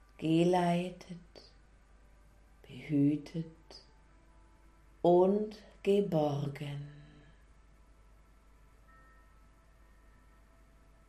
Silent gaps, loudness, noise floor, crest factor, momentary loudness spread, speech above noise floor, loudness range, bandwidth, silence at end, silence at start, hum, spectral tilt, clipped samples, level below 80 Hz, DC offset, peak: none; -32 LUFS; -61 dBFS; 20 dB; 23 LU; 31 dB; 7 LU; 13 kHz; 4.05 s; 0.2 s; none; -8 dB/octave; under 0.1%; -62 dBFS; under 0.1%; -14 dBFS